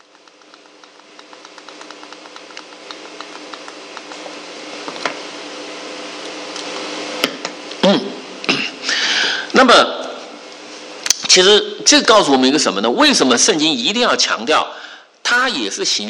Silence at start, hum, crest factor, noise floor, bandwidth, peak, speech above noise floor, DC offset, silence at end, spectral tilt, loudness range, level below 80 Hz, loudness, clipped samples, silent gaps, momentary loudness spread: 1.3 s; none; 18 dB; -46 dBFS; 11.5 kHz; 0 dBFS; 33 dB; under 0.1%; 0 s; -1.5 dB/octave; 21 LU; -60 dBFS; -14 LUFS; under 0.1%; none; 24 LU